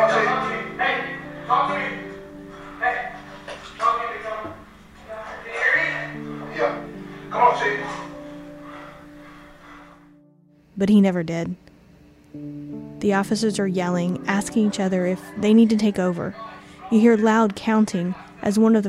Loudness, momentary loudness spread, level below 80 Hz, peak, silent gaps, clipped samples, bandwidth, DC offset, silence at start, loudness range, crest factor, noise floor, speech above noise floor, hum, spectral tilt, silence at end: -22 LUFS; 21 LU; -56 dBFS; -4 dBFS; none; under 0.1%; 12.5 kHz; under 0.1%; 0 s; 7 LU; 18 dB; -55 dBFS; 35 dB; none; -6 dB/octave; 0 s